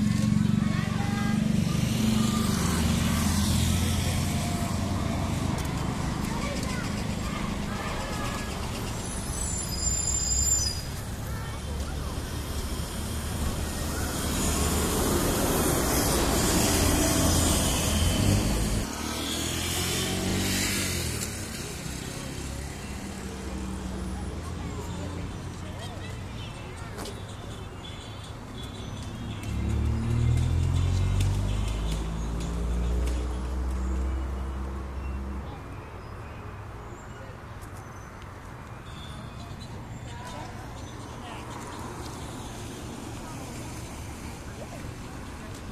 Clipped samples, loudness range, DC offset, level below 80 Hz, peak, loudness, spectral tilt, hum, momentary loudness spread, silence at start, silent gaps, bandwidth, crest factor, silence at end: under 0.1%; 14 LU; under 0.1%; -36 dBFS; -10 dBFS; -29 LUFS; -4.5 dB/octave; none; 15 LU; 0 s; none; 15 kHz; 20 dB; 0 s